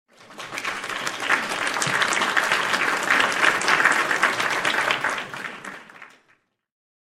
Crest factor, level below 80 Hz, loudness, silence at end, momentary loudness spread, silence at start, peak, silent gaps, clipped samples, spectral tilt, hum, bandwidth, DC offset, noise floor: 22 dB; -70 dBFS; -21 LUFS; 1 s; 15 LU; 0.2 s; -2 dBFS; none; under 0.1%; -1 dB/octave; none; 16 kHz; under 0.1%; -64 dBFS